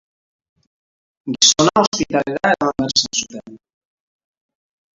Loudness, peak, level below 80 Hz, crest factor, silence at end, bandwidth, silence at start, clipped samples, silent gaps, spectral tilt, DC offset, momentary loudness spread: -16 LUFS; 0 dBFS; -54 dBFS; 20 dB; 1.4 s; 8 kHz; 1.25 s; under 0.1%; 1.87-1.92 s; -2 dB/octave; under 0.1%; 19 LU